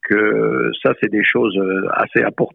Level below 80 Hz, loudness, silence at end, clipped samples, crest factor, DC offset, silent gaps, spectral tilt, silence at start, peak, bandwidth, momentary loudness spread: -60 dBFS; -16 LUFS; 0.05 s; under 0.1%; 14 dB; under 0.1%; none; -8.5 dB/octave; 0.05 s; -2 dBFS; 4.1 kHz; 3 LU